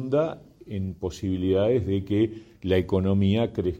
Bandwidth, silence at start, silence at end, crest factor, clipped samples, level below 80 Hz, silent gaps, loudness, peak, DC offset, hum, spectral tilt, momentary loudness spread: 8 kHz; 0 s; 0 s; 16 dB; under 0.1%; -50 dBFS; none; -25 LUFS; -10 dBFS; under 0.1%; none; -8 dB/octave; 11 LU